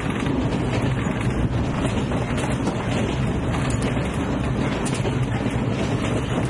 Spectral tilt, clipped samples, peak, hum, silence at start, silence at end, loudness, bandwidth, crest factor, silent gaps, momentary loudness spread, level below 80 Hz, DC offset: -6.5 dB/octave; under 0.1%; -10 dBFS; none; 0 s; 0 s; -23 LUFS; 11.5 kHz; 14 dB; none; 1 LU; -34 dBFS; under 0.1%